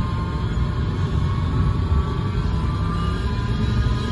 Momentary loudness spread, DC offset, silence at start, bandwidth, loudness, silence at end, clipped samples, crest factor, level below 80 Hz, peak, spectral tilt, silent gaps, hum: 2 LU; under 0.1%; 0 s; 11.5 kHz; -23 LUFS; 0 s; under 0.1%; 12 dB; -26 dBFS; -8 dBFS; -7.5 dB/octave; none; none